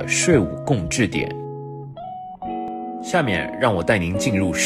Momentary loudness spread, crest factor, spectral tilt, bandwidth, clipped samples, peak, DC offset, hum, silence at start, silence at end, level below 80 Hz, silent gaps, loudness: 16 LU; 18 dB; -4.5 dB/octave; 15.5 kHz; under 0.1%; -4 dBFS; under 0.1%; none; 0 s; 0 s; -46 dBFS; none; -21 LUFS